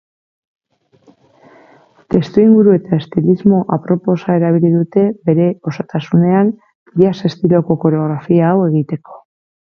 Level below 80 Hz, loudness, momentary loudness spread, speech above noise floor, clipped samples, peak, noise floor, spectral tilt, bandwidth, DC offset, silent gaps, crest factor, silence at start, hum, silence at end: -52 dBFS; -14 LUFS; 7 LU; 38 dB; under 0.1%; 0 dBFS; -51 dBFS; -10 dB/octave; 6.4 kHz; under 0.1%; 6.75-6.86 s; 14 dB; 2.1 s; none; 0.6 s